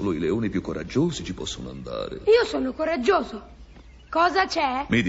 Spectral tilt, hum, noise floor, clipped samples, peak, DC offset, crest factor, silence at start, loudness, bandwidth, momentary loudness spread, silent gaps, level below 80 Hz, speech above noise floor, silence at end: -5.5 dB/octave; none; -47 dBFS; under 0.1%; -8 dBFS; under 0.1%; 18 dB; 0 s; -24 LUFS; 8 kHz; 12 LU; none; -46 dBFS; 23 dB; 0 s